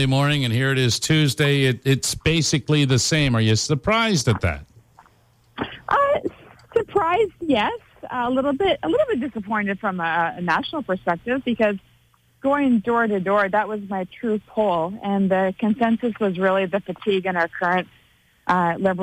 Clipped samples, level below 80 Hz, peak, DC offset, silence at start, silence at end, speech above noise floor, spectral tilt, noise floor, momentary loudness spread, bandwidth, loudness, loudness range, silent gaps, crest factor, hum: under 0.1%; -48 dBFS; -8 dBFS; under 0.1%; 0 s; 0 s; 38 dB; -5 dB/octave; -59 dBFS; 8 LU; 16 kHz; -21 LUFS; 4 LU; none; 14 dB; none